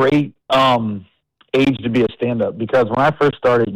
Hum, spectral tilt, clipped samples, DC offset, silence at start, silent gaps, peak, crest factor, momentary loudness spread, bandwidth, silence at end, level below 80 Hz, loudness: none; -7 dB/octave; under 0.1%; under 0.1%; 0 s; none; -8 dBFS; 8 dB; 6 LU; 13.5 kHz; 0 s; -50 dBFS; -17 LUFS